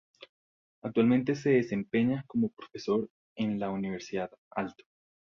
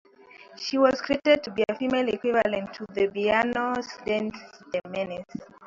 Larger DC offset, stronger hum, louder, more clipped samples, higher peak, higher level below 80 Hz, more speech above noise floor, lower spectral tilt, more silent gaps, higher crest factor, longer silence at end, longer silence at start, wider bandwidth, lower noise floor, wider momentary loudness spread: neither; neither; second, -31 LUFS vs -26 LUFS; neither; second, -12 dBFS vs -6 dBFS; second, -68 dBFS vs -62 dBFS; first, over 60 dB vs 25 dB; first, -7.5 dB/octave vs -5 dB/octave; first, 3.10-3.36 s, 4.38-4.51 s vs none; about the same, 18 dB vs 20 dB; first, 0.6 s vs 0 s; first, 0.85 s vs 0.35 s; about the same, 7.2 kHz vs 7.6 kHz; first, under -90 dBFS vs -51 dBFS; about the same, 11 LU vs 12 LU